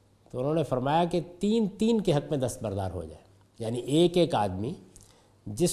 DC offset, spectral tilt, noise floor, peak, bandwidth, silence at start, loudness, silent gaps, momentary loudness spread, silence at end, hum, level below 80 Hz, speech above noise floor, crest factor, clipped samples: under 0.1%; -6 dB/octave; -56 dBFS; -12 dBFS; 14 kHz; 0.35 s; -28 LUFS; none; 16 LU; 0 s; none; -52 dBFS; 29 dB; 18 dB; under 0.1%